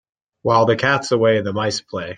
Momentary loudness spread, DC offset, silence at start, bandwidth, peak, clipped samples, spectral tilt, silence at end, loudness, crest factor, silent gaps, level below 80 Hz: 8 LU; under 0.1%; 0.45 s; 9.6 kHz; -2 dBFS; under 0.1%; -5 dB/octave; 0 s; -18 LUFS; 16 dB; none; -58 dBFS